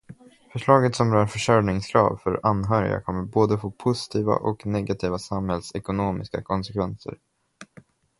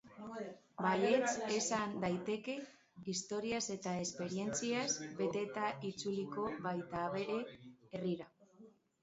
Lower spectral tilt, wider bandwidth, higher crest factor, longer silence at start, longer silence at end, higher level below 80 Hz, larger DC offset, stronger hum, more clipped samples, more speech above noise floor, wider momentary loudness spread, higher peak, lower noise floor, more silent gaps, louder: first, -6.5 dB/octave vs -4 dB/octave; first, 11.5 kHz vs 8 kHz; about the same, 22 dB vs 20 dB; about the same, 0.1 s vs 0.05 s; first, 0.55 s vs 0.35 s; first, -48 dBFS vs -74 dBFS; neither; neither; neither; first, 30 dB vs 25 dB; second, 9 LU vs 13 LU; first, -2 dBFS vs -20 dBFS; second, -53 dBFS vs -63 dBFS; neither; first, -24 LUFS vs -39 LUFS